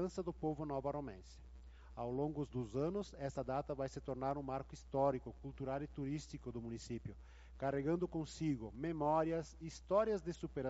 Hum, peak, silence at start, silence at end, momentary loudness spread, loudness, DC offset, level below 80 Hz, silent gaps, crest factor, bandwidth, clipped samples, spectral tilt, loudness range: none; -22 dBFS; 0 s; 0 s; 15 LU; -42 LUFS; under 0.1%; -58 dBFS; none; 20 dB; 8 kHz; under 0.1%; -7 dB/octave; 4 LU